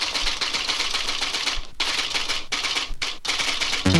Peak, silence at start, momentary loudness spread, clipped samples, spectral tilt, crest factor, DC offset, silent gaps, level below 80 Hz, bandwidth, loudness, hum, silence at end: -2 dBFS; 0 s; 3 LU; under 0.1%; -2.5 dB/octave; 22 dB; under 0.1%; none; -38 dBFS; 15.5 kHz; -23 LUFS; none; 0 s